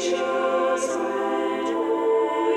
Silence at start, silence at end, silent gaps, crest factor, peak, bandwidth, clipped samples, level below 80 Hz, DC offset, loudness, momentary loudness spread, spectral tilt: 0 s; 0 s; none; 12 dB; -12 dBFS; 12.5 kHz; under 0.1%; -68 dBFS; under 0.1%; -23 LUFS; 3 LU; -3 dB/octave